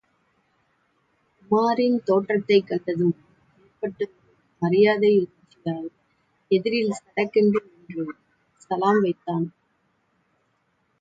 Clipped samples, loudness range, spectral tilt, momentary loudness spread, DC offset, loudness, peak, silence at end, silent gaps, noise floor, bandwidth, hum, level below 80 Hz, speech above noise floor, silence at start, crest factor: under 0.1%; 3 LU; -7 dB/octave; 14 LU; under 0.1%; -23 LUFS; -6 dBFS; 1.5 s; none; -69 dBFS; 7.8 kHz; none; -70 dBFS; 48 dB; 1.5 s; 18 dB